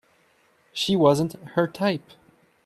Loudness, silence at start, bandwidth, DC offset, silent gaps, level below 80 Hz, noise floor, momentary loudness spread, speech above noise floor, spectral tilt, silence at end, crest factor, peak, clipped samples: -23 LUFS; 0.75 s; 14 kHz; under 0.1%; none; -62 dBFS; -62 dBFS; 11 LU; 40 dB; -5.5 dB/octave; 0.65 s; 20 dB; -6 dBFS; under 0.1%